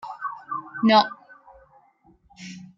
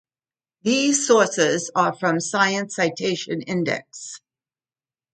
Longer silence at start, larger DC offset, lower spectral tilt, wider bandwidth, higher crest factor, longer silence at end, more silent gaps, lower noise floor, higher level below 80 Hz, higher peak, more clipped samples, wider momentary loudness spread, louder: second, 0.05 s vs 0.65 s; neither; first, -5.5 dB/octave vs -3.5 dB/octave; second, 7.4 kHz vs 9.6 kHz; about the same, 22 dB vs 20 dB; second, 0.2 s vs 0.95 s; neither; second, -59 dBFS vs under -90 dBFS; about the same, -68 dBFS vs -70 dBFS; about the same, -4 dBFS vs -4 dBFS; neither; first, 24 LU vs 13 LU; about the same, -22 LUFS vs -21 LUFS